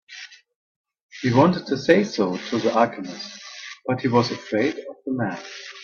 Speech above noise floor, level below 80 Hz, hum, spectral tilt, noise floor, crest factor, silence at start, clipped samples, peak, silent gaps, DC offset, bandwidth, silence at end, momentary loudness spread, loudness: 21 dB; -64 dBFS; none; -6 dB/octave; -43 dBFS; 24 dB; 0.1 s; under 0.1%; 0 dBFS; 0.56-0.84 s, 1.01-1.09 s; under 0.1%; 7.2 kHz; 0 s; 18 LU; -22 LUFS